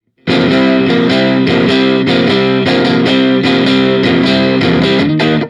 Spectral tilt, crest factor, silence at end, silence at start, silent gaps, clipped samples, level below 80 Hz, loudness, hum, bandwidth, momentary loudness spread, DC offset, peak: -6.5 dB/octave; 10 dB; 0 s; 0.25 s; none; under 0.1%; -42 dBFS; -10 LUFS; none; 9.8 kHz; 1 LU; under 0.1%; 0 dBFS